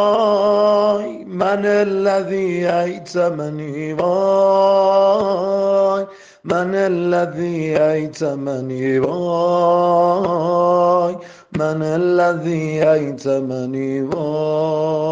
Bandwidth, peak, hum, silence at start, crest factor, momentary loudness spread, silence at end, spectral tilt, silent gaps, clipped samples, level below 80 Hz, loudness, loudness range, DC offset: 7.8 kHz; -2 dBFS; none; 0 s; 14 dB; 8 LU; 0 s; -7 dB/octave; none; under 0.1%; -60 dBFS; -17 LUFS; 3 LU; under 0.1%